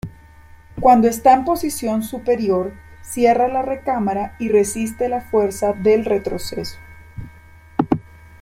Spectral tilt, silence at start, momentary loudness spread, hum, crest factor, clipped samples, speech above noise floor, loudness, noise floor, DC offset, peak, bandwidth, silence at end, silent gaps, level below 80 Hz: -5.5 dB/octave; 0.05 s; 16 LU; none; 18 dB; under 0.1%; 27 dB; -18 LUFS; -44 dBFS; under 0.1%; -2 dBFS; 16.5 kHz; 0.4 s; none; -44 dBFS